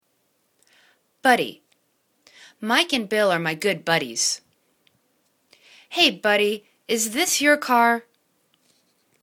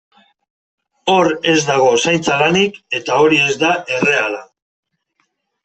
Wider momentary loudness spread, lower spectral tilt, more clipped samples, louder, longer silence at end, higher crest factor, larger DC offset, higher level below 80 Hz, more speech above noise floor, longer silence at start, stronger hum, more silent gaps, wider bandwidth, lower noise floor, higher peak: first, 10 LU vs 7 LU; second, -2 dB/octave vs -3.5 dB/octave; neither; second, -21 LUFS vs -14 LUFS; about the same, 1.2 s vs 1.2 s; first, 22 dB vs 14 dB; neither; second, -72 dBFS vs -58 dBFS; second, 48 dB vs 52 dB; first, 1.25 s vs 1.05 s; neither; neither; first, 19 kHz vs 8.6 kHz; about the same, -69 dBFS vs -67 dBFS; about the same, -2 dBFS vs -2 dBFS